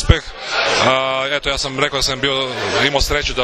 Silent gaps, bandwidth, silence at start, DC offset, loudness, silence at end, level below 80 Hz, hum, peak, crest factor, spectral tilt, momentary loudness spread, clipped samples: none; 14 kHz; 0 s; under 0.1%; -17 LUFS; 0 s; -28 dBFS; none; 0 dBFS; 18 dB; -3.5 dB/octave; 4 LU; under 0.1%